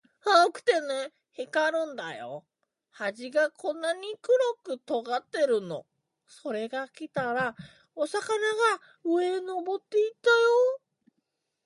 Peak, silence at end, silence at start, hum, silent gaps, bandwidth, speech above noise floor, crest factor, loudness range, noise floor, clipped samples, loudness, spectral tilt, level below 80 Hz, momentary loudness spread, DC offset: -8 dBFS; 0.9 s; 0.25 s; none; none; 11.5 kHz; 53 dB; 22 dB; 5 LU; -80 dBFS; under 0.1%; -28 LUFS; -3.5 dB/octave; -78 dBFS; 15 LU; under 0.1%